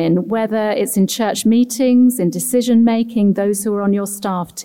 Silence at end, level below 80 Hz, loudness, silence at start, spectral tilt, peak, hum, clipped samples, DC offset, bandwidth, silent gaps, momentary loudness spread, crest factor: 0 s; -58 dBFS; -16 LUFS; 0 s; -5.5 dB/octave; -6 dBFS; none; under 0.1%; 0.2%; 17 kHz; none; 6 LU; 10 dB